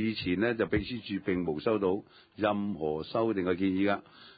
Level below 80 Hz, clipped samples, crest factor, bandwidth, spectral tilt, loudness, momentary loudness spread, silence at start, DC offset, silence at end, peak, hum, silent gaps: -54 dBFS; under 0.1%; 16 dB; 5 kHz; -10.5 dB/octave; -31 LUFS; 6 LU; 0 s; under 0.1%; 0.05 s; -16 dBFS; none; none